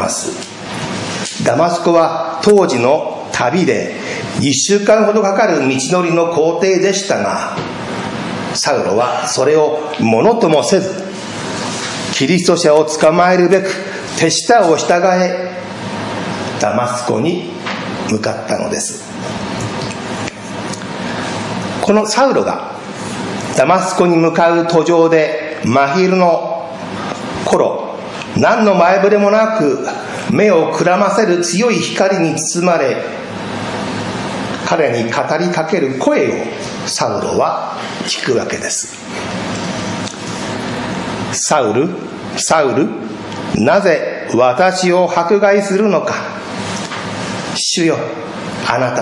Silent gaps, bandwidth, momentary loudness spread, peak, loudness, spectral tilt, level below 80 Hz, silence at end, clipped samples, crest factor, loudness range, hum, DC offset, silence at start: none; 11.5 kHz; 12 LU; 0 dBFS; -15 LUFS; -4.5 dB/octave; -52 dBFS; 0 s; under 0.1%; 14 dB; 6 LU; none; under 0.1%; 0 s